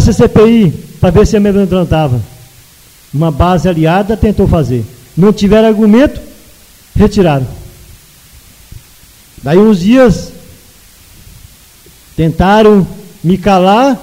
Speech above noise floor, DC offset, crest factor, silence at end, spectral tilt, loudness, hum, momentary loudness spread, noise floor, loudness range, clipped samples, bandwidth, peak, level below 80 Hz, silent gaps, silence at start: 33 dB; under 0.1%; 10 dB; 0 s; -7 dB/octave; -9 LUFS; none; 12 LU; -40 dBFS; 3 LU; 0.6%; 16.5 kHz; 0 dBFS; -26 dBFS; none; 0 s